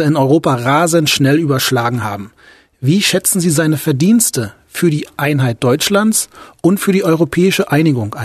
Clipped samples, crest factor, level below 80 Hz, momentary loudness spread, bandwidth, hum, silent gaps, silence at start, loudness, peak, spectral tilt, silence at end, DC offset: under 0.1%; 14 dB; -50 dBFS; 6 LU; 14 kHz; none; none; 0 s; -13 LUFS; 0 dBFS; -4.5 dB/octave; 0 s; under 0.1%